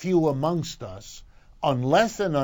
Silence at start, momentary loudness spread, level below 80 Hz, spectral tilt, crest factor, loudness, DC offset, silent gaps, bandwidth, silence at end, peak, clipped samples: 0 s; 18 LU; -50 dBFS; -6 dB/octave; 18 dB; -24 LUFS; under 0.1%; none; 19 kHz; 0 s; -8 dBFS; under 0.1%